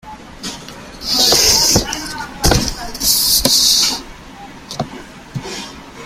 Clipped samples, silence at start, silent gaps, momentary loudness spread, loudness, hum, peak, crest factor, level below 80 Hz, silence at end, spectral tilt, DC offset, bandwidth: under 0.1%; 0.05 s; none; 20 LU; -12 LUFS; none; 0 dBFS; 18 dB; -30 dBFS; 0 s; -1.5 dB/octave; under 0.1%; 16.5 kHz